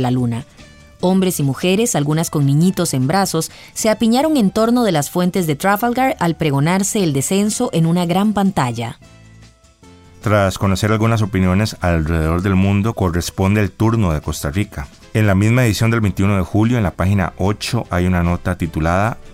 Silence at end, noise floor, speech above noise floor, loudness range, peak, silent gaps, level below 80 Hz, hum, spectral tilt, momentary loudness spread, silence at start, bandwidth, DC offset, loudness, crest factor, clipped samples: 0 s; -45 dBFS; 30 dB; 3 LU; -2 dBFS; none; -38 dBFS; none; -6 dB/octave; 6 LU; 0 s; 16 kHz; under 0.1%; -17 LUFS; 14 dB; under 0.1%